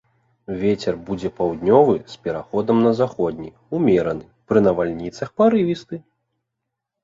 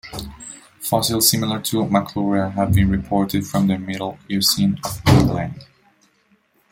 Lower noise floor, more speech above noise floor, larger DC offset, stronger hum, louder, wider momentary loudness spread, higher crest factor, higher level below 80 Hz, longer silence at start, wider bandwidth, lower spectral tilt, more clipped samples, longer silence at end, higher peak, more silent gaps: first, -81 dBFS vs -61 dBFS; first, 61 dB vs 42 dB; neither; neither; about the same, -20 LUFS vs -19 LUFS; second, 13 LU vs 16 LU; about the same, 18 dB vs 20 dB; second, -52 dBFS vs -38 dBFS; first, 0.5 s vs 0.05 s; second, 7.6 kHz vs 16.5 kHz; first, -8 dB/octave vs -4.5 dB/octave; neither; about the same, 1.05 s vs 1.05 s; about the same, -2 dBFS vs 0 dBFS; neither